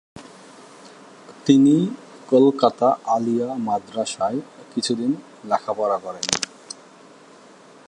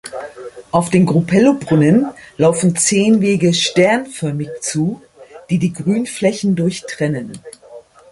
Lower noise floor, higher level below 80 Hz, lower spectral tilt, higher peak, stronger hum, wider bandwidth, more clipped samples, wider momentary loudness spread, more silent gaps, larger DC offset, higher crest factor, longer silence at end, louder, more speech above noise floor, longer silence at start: first, -47 dBFS vs -40 dBFS; second, -66 dBFS vs -52 dBFS; about the same, -5 dB/octave vs -5 dB/octave; about the same, 0 dBFS vs 0 dBFS; neither; about the same, 11 kHz vs 11.5 kHz; neither; about the same, 15 LU vs 13 LU; neither; neither; first, 22 dB vs 14 dB; first, 1.45 s vs 0.3 s; second, -21 LUFS vs -15 LUFS; about the same, 28 dB vs 25 dB; about the same, 0.15 s vs 0.05 s